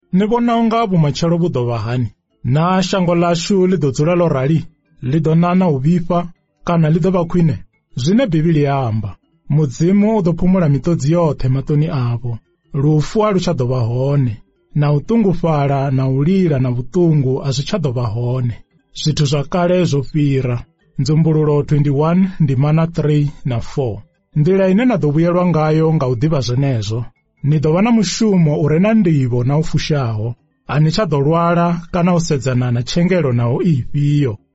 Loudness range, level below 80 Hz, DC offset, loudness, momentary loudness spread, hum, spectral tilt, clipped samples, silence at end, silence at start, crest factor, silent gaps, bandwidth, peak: 2 LU; -36 dBFS; under 0.1%; -16 LUFS; 8 LU; none; -7.5 dB/octave; under 0.1%; 0.2 s; 0.15 s; 10 dB; none; 8 kHz; -6 dBFS